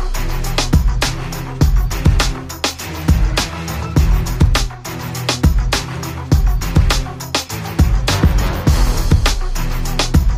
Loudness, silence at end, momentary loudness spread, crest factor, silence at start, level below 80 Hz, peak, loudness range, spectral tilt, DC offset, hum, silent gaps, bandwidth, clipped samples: -17 LUFS; 0 s; 7 LU; 12 dB; 0 s; -18 dBFS; -2 dBFS; 1 LU; -4.5 dB/octave; under 0.1%; none; none; 16 kHz; under 0.1%